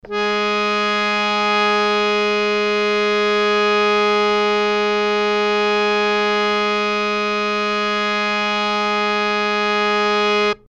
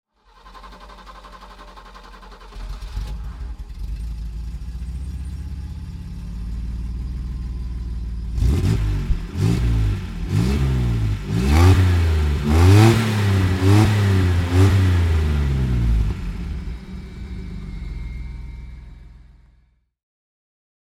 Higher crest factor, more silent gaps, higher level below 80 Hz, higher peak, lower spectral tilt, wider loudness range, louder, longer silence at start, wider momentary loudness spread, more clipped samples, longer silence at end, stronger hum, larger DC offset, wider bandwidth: second, 14 dB vs 20 dB; neither; second, -52 dBFS vs -26 dBFS; second, -4 dBFS vs 0 dBFS; second, -3.5 dB/octave vs -7 dB/octave; second, 2 LU vs 20 LU; first, -17 LUFS vs -20 LUFS; second, 0.05 s vs 0.45 s; second, 3 LU vs 23 LU; neither; second, 0.15 s vs 1.65 s; neither; neither; second, 8.8 kHz vs 14.5 kHz